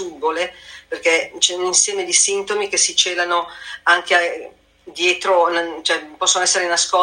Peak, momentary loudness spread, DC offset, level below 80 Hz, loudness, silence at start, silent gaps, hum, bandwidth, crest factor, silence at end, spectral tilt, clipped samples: 0 dBFS; 9 LU; under 0.1%; -62 dBFS; -17 LUFS; 0 s; none; none; 16.5 kHz; 18 dB; 0 s; 1 dB/octave; under 0.1%